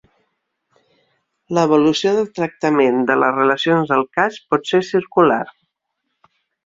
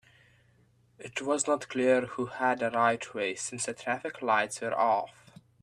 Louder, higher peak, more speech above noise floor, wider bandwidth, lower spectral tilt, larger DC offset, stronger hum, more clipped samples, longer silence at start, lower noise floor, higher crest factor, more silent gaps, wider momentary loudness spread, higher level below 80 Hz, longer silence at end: first, -17 LUFS vs -29 LUFS; first, -2 dBFS vs -12 dBFS; first, 59 dB vs 35 dB; second, 7.8 kHz vs 13 kHz; first, -5.5 dB/octave vs -3.5 dB/octave; neither; neither; neither; first, 1.5 s vs 1 s; first, -75 dBFS vs -65 dBFS; about the same, 16 dB vs 20 dB; neither; about the same, 7 LU vs 9 LU; first, -62 dBFS vs -74 dBFS; first, 1.15 s vs 0.55 s